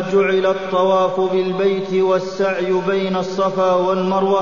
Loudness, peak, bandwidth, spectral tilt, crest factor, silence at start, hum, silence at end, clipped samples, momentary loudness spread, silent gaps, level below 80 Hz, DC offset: -17 LUFS; -4 dBFS; 7.4 kHz; -6.5 dB/octave; 12 dB; 0 s; none; 0 s; under 0.1%; 4 LU; none; -56 dBFS; 0.7%